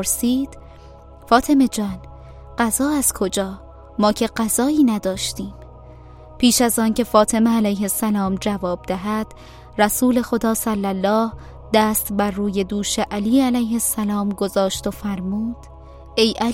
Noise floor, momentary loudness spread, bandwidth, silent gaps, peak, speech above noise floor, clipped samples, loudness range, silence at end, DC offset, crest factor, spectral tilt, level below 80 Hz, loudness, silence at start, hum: -42 dBFS; 10 LU; 16.5 kHz; none; 0 dBFS; 23 dB; under 0.1%; 2 LU; 0 s; under 0.1%; 20 dB; -4 dB/octave; -42 dBFS; -19 LUFS; 0 s; none